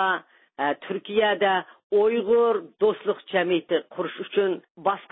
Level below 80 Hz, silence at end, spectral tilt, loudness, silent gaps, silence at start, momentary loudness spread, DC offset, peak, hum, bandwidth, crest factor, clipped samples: -68 dBFS; 0.1 s; -9 dB/octave; -24 LUFS; 1.84-1.90 s, 4.70-4.75 s; 0 s; 8 LU; under 0.1%; -8 dBFS; none; 4 kHz; 16 dB; under 0.1%